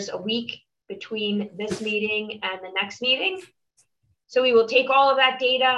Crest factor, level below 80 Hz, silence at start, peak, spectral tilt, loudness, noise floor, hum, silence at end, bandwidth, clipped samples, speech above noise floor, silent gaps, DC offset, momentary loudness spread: 18 dB; -68 dBFS; 0 s; -6 dBFS; -3.5 dB/octave; -22 LUFS; -67 dBFS; none; 0 s; 11.5 kHz; under 0.1%; 44 dB; none; under 0.1%; 16 LU